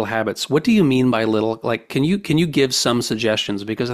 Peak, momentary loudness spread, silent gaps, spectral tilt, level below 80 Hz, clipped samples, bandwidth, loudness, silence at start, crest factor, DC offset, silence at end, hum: -4 dBFS; 6 LU; none; -5 dB/octave; -52 dBFS; under 0.1%; 15.5 kHz; -19 LUFS; 0 s; 14 dB; under 0.1%; 0 s; none